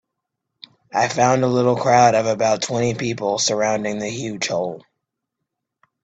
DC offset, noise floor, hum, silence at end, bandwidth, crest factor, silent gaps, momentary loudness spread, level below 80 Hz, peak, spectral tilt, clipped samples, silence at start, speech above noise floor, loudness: under 0.1%; -80 dBFS; none; 1.25 s; 9.2 kHz; 18 dB; none; 11 LU; -60 dBFS; -2 dBFS; -4 dB/octave; under 0.1%; 0.95 s; 61 dB; -19 LUFS